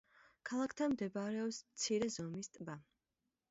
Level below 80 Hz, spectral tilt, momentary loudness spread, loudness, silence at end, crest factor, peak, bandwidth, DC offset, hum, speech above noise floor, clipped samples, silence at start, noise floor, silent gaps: -78 dBFS; -4.5 dB/octave; 13 LU; -41 LUFS; 0.7 s; 16 dB; -26 dBFS; 7.6 kHz; under 0.1%; none; 49 dB; under 0.1%; 0.45 s; -89 dBFS; none